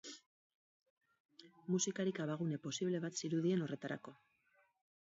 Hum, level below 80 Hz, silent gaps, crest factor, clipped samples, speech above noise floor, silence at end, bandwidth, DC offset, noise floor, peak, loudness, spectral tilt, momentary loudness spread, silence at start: none; -88 dBFS; 0.26-0.80 s, 0.90-1.01 s, 1.20-1.29 s; 16 dB; under 0.1%; 37 dB; 0.9 s; 7.6 kHz; under 0.1%; -76 dBFS; -26 dBFS; -40 LUFS; -6 dB/octave; 17 LU; 0.05 s